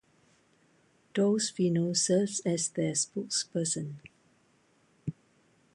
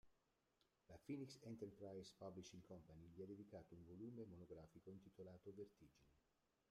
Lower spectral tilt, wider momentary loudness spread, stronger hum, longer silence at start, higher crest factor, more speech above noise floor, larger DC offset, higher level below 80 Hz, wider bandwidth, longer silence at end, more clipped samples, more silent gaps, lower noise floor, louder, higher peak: second, -4 dB/octave vs -6.5 dB/octave; first, 15 LU vs 8 LU; neither; first, 1.15 s vs 0.05 s; about the same, 18 dB vs 18 dB; first, 38 dB vs 28 dB; neither; first, -72 dBFS vs -84 dBFS; second, 11.5 kHz vs 13 kHz; first, 0.65 s vs 0.5 s; neither; neither; second, -67 dBFS vs -87 dBFS; first, -29 LUFS vs -60 LUFS; first, -16 dBFS vs -42 dBFS